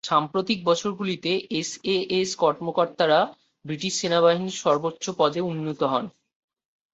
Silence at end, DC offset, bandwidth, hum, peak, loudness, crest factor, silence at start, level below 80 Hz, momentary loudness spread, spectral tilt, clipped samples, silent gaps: 0.85 s; under 0.1%; 8.2 kHz; none; -6 dBFS; -24 LUFS; 18 dB; 0.05 s; -66 dBFS; 8 LU; -4 dB/octave; under 0.1%; none